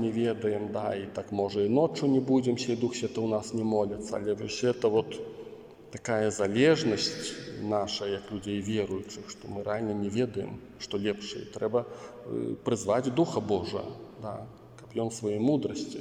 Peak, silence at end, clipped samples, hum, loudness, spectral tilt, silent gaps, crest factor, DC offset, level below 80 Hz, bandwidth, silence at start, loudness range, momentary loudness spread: -12 dBFS; 0 s; under 0.1%; none; -30 LUFS; -5.5 dB/octave; none; 18 dB; under 0.1%; -64 dBFS; 11 kHz; 0 s; 5 LU; 14 LU